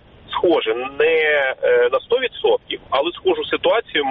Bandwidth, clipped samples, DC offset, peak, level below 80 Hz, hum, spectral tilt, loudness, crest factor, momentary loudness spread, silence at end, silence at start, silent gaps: 4.7 kHz; under 0.1%; under 0.1%; -6 dBFS; -54 dBFS; none; -0.5 dB/octave; -18 LUFS; 14 dB; 5 LU; 0 s; 0.3 s; none